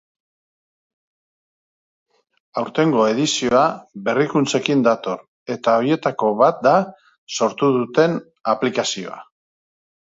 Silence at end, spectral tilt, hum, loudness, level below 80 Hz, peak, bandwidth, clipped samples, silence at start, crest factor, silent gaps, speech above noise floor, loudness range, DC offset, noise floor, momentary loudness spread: 0.9 s; -4.5 dB/octave; none; -19 LUFS; -64 dBFS; -2 dBFS; 8 kHz; under 0.1%; 2.55 s; 18 dB; 5.28-5.46 s, 7.18-7.27 s; over 72 dB; 3 LU; under 0.1%; under -90 dBFS; 12 LU